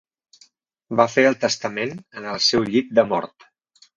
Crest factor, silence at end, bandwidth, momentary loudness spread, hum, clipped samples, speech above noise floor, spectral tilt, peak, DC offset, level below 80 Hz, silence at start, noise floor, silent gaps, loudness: 20 dB; 0.7 s; 7.6 kHz; 13 LU; none; under 0.1%; 37 dB; -3.5 dB/octave; -2 dBFS; under 0.1%; -60 dBFS; 0.9 s; -57 dBFS; none; -20 LUFS